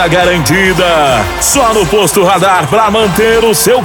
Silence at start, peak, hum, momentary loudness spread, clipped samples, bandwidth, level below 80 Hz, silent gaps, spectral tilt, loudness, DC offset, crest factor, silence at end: 0 s; 0 dBFS; none; 1 LU; under 0.1%; over 20 kHz; -28 dBFS; none; -3.5 dB/octave; -8 LUFS; under 0.1%; 8 dB; 0 s